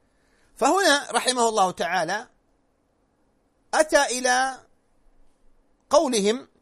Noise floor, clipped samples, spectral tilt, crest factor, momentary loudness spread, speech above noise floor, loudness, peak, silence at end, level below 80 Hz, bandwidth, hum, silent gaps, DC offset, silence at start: -67 dBFS; under 0.1%; -2 dB/octave; 20 dB; 8 LU; 45 dB; -22 LUFS; -4 dBFS; 0.2 s; -60 dBFS; 13.5 kHz; none; none; under 0.1%; 0.6 s